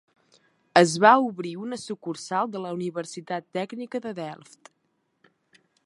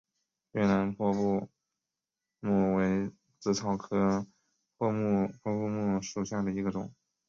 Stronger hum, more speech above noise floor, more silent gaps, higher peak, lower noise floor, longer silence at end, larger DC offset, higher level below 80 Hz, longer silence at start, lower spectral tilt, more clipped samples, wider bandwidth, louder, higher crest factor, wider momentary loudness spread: neither; second, 48 dB vs 60 dB; neither; first, -2 dBFS vs -14 dBFS; second, -73 dBFS vs -89 dBFS; first, 1.5 s vs 0.35 s; neither; second, -78 dBFS vs -60 dBFS; first, 0.75 s vs 0.55 s; second, -4.5 dB/octave vs -6.5 dB/octave; neither; first, 11.5 kHz vs 7.4 kHz; first, -25 LUFS vs -31 LUFS; first, 26 dB vs 18 dB; first, 17 LU vs 11 LU